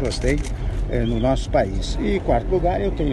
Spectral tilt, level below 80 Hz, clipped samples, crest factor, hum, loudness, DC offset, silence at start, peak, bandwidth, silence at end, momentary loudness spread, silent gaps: -6.5 dB/octave; -26 dBFS; under 0.1%; 16 dB; none; -22 LUFS; under 0.1%; 0 s; -6 dBFS; 11.5 kHz; 0 s; 5 LU; none